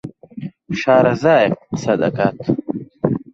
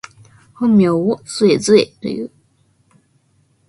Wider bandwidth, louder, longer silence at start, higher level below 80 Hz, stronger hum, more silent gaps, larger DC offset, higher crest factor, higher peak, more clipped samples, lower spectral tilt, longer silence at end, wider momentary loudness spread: second, 7.8 kHz vs 11.5 kHz; about the same, -17 LUFS vs -15 LUFS; second, 0.05 s vs 0.6 s; first, -52 dBFS vs -58 dBFS; neither; neither; neither; about the same, 16 dB vs 18 dB; about the same, 0 dBFS vs 0 dBFS; neither; first, -7 dB/octave vs -5.5 dB/octave; second, 0.15 s vs 1.4 s; first, 19 LU vs 13 LU